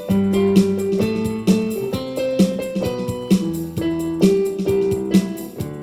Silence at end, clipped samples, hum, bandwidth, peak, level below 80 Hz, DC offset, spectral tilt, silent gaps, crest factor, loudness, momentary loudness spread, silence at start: 0 s; under 0.1%; none; 15.5 kHz; -2 dBFS; -46 dBFS; under 0.1%; -7 dB/octave; none; 18 dB; -20 LUFS; 8 LU; 0 s